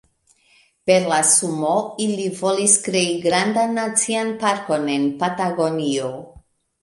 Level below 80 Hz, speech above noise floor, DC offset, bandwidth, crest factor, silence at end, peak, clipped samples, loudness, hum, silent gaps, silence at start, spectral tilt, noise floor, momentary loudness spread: -62 dBFS; 39 dB; under 0.1%; 12 kHz; 18 dB; 0.45 s; -2 dBFS; under 0.1%; -19 LUFS; none; none; 0.85 s; -3 dB/octave; -59 dBFS; 8 LU